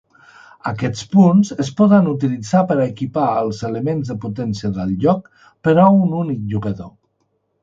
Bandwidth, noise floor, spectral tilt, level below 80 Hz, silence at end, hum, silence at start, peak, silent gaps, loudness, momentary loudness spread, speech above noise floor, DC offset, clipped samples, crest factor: 7.6 kHz; -67 dBFS; -8 dB/octave; -50 dBFS; 0.75 s; none; 0.65 s; 0 dBFS; none; -17 LUFS; 11 LU; 51 dB; under 0.1%; under 0.1%; 16 dB